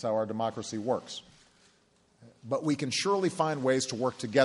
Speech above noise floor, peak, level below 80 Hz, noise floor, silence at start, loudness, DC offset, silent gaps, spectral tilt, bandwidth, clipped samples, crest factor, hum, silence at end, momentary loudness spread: 37 dB; -8 dBFS; -72 dBFS; -66 dBFS; 0 s; -30 LUFS; under 0.1%; none; -4.5 dB/octave; 11.5 kHz; under 0.1%; 22 dB; none; 0 s; 8 LU